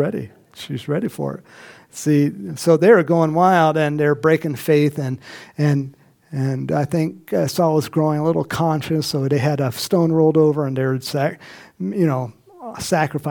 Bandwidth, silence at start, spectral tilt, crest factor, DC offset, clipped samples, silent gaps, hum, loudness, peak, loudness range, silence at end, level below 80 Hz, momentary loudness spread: 19 kHz; 0 s; -6.5 dB/octave; 18 dB; under 0.1%; under 0.1%; none; none; -19 LUFS; -2 dBFS; 4 LU; 0 s; -58 dBFS; 16 LU